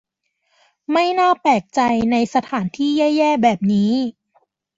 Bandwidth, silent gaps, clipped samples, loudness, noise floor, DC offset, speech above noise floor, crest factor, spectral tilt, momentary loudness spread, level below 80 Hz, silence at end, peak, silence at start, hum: 7.8 kHz; none; under 0.1%; -18 LUFS; -69 dBFS; under 0.1%; 53 dB; 16 dB; -6 dB/octave; 6 LU; -56 dBFS; 0.65 s; -2 dBFS; 0.9 s; none